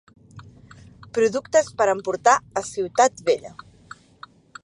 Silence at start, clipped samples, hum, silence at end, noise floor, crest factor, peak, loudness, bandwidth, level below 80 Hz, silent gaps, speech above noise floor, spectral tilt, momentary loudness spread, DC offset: 0.35 s; under 0.1%; none; 1.15 s; -48 dBFS; 20 dB; -2 dBFS; -21 LUFS; 11 kHz; -60 dBFS; none; 27 dB; -3 dB/octave; 13 LU; under 0.1%